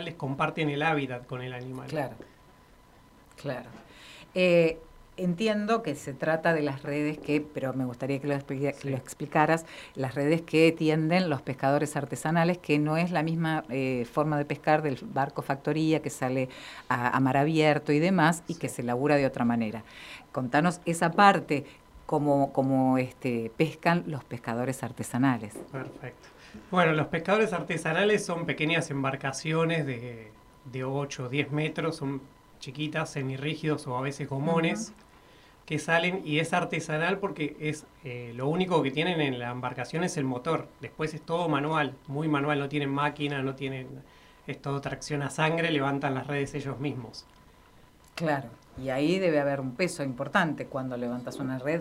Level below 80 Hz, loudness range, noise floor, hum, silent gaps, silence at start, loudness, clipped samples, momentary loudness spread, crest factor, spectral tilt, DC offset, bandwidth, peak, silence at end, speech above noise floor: -62 dBFS; 6 LU; -56 dBFS; none; none; 0 s; -28 LUFS; under 0.1%; 13 LU; 24 dB; -6 dB/octave; under 0.1%; 15.5 kHz; -4 dBFS; 0 s; 28 dB